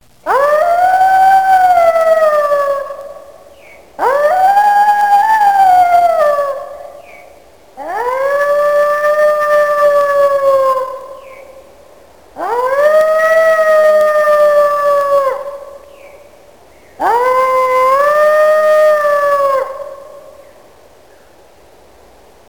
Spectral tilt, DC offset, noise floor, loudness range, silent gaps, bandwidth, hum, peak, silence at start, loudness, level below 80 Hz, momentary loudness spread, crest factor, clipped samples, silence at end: -2.5 dB/octave; 0.7%; -44 dBFS; 4 LU; none; 17.5 kHz; none; 0 dBFS; 0.25 s; -11 LUFS; -54 dBFS; 14 LU; 12 dB; under 0.1%; 2.3 s